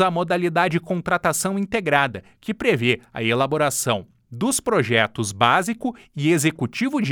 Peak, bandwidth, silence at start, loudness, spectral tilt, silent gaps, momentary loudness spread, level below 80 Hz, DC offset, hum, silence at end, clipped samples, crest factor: 0 dBFS; over 20 kHz; 0 s; -21 LUFS; -4.5 dB/octave; none; 8 LU; -56 dBFS; under 0.1%; none; 0 s; under 0.1%; 20 dB